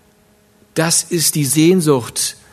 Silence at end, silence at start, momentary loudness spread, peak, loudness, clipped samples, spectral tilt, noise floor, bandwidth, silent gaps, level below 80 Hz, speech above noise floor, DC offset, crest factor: 0.2 s; 0.75 s; 8 LU; 0 dBFS; -15 LUFS; under 0.1%; -4 dB/octave; -53 dBFS; 14 kHz; none; -58 dBFS; 38 dB; under 0.1%; 16 dB